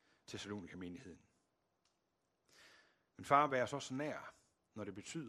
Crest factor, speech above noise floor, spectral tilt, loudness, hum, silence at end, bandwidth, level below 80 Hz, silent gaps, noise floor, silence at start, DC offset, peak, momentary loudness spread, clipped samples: 28 dB; 44 dB; -4.5 dB/octave; -40 LUFS; none; 0 s; 13.5 kHz; -82 dBFS; none; -84 dBFS; 0.3 s; under 0.1%; -16 dBFS; 23 LU; under 0.1%